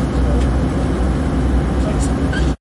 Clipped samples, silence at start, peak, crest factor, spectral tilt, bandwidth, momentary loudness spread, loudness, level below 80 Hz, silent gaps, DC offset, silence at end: under 0.1%; 0 s; -6 dBFS; 10 dB; -7 dB/octave; 11.5 kHz; 1 LU; -18 LUFS; -20 dBFS; none; under 0.1%; 0.05 s